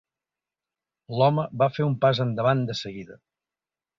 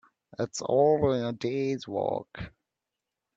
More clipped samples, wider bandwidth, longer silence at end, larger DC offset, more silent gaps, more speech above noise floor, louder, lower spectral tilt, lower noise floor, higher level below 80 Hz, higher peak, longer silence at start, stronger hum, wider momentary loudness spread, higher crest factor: neither; about the same, 7.4 kHz vs 8 kHz; about the same, 0.85 s vs 0.9 s; neither; neither; first, over 66 dB vs 59 dB; first, -24 LUFS vs -28 LUFS; about the same, -7 dB/octave vs -6 dB/octave; about the same, under -90 dBFS vs -87 dBFS; about the same, -62 dBFS vs -60 dBFS; first, -6 dBFS vs -12 dBFS; first, 1.1 s vs 0.4 s; neither; second, 12 LU vs 19 LU; about the same, 20 dB vs 18 dB